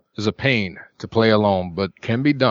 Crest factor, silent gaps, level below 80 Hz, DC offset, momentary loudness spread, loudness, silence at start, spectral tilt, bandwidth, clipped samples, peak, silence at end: 18 dB; none; -54 dBFS; under 0.1%; 10 LU; -20 LUFS; 0.2 s; -7 dB/octave; 7.6 kHz; under 0.1%; -2 dBFS; 0 s